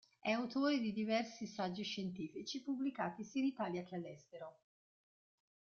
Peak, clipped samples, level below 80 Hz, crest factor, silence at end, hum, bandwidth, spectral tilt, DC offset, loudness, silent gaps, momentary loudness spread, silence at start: -24 dBFS; under 0.1%; -82 dBFS; 18 dB; 1.25 s; none; 7 kHz; -4 dB/octave; under 0.1%; -41 LUFS; none; 14 LU; 0.25 s